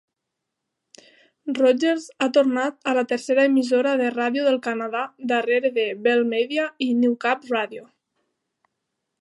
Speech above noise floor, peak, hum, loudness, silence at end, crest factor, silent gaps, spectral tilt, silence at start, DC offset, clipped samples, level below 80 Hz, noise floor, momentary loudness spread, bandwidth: 61 dB; -6 dBFS; none; -22 LUFS; 1.35 s; 16 dB; none; -4 dB/octave; 1.45 s; under 0.1%; under 0.1%; -80 dBFS; -82 dBFS; 8 LU; 11.5 kHz